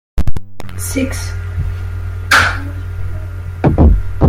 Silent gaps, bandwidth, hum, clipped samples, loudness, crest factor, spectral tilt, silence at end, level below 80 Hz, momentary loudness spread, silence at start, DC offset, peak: none; 16.5 kHz; none; 0.3%; -16 LUFS; 14 dB; -5 dB/octave; 0 s; -20 dBFS; 14 LU; 0.15 s; under 0.1%; 0 dBFS